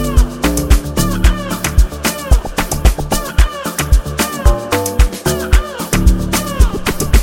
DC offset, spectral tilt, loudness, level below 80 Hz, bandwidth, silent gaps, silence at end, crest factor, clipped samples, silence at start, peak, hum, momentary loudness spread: under 0.1%; -4.5 dB/octave; -15 LUFS; -14 dBFS; 17 kHz; none; 0 s; 12 dB; under 0.1%; 0 s; 0 dBFS; none; 4 LU